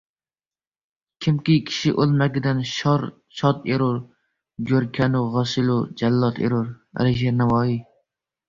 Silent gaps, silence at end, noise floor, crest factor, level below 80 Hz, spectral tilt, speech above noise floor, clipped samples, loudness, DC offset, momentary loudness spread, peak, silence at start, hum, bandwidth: none; 0.65 s; under -90 dBFS; 16 dB; -52 dBFS; -7 dB/octave; over 69 dB; under 0.1%; -22 LUFS; under 0.1%; 6 LU; -6 dBFS; 1.2 s; none; 7.4 kHz